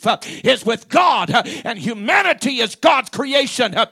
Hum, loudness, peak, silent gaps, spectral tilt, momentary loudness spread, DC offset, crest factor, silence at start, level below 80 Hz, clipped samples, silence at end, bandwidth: none; -17 LUFS; 0 dBFS; none; -3.5 dB/octave; 7 LU; under 0.1%; 16 dB; 0 s; -64 dBFS; under 0.1%; 0.05 s; 15.5 kHz